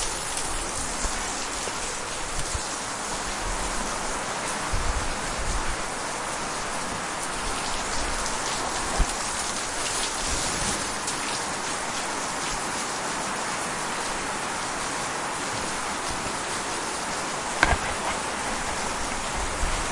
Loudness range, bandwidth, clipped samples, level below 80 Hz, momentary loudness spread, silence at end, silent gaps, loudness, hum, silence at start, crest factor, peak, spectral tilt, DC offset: 2 LU; 11.5 kHz; under 0.1%; -38 dBFS; 3 LU; 0 s; none; -27 LUFS; none; 0 s; 28 dB; 0 dBFS; -2 dB/octave; under 0.1%